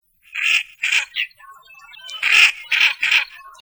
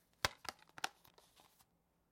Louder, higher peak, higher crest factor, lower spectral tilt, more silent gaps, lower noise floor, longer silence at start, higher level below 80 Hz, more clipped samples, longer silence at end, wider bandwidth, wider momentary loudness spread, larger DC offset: first, -16 LUFS vs -45 LUFS; first, 0 dBFS vs -14 dBFS; second, 20 dB vs 36 dB; second, 4 dB/octave vs -1.5 dB/octave; neither; second, -45 dBFS vs -77 dBFS; about the same, 0.35 s vs 0.25 s; about the same, -68 dBFS vs -68 dBFS; neither; second, 0.1 s vs 1.25 s; first, over 20 kHz vs 16.5 kHz; second, 18 LU vs 25 LU; neither